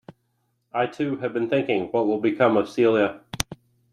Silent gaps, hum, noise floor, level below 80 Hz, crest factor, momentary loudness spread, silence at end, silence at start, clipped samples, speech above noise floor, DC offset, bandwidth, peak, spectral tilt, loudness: none; none; -72 dBFS; -54 dBFS; 24 dB; 10 LU; 0.4 s; 0.75 s; under 0.1%; 50 dB; under 0.1%; 15.5 kHz; 0 dBFS; -5 dB/octave; -23 LUFS